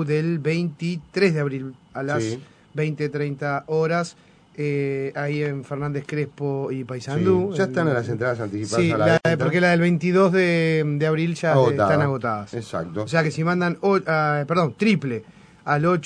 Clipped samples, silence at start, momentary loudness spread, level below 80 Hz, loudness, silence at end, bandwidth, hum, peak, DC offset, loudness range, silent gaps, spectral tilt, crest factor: under 0.1%; 0 s; 11 LU; -58 dBFS; -22 LUFS; 0 s; 10 kHz; none; -4 dBFS; under 0.1%; 7 LU; none; -7 dB/octave; 18 dB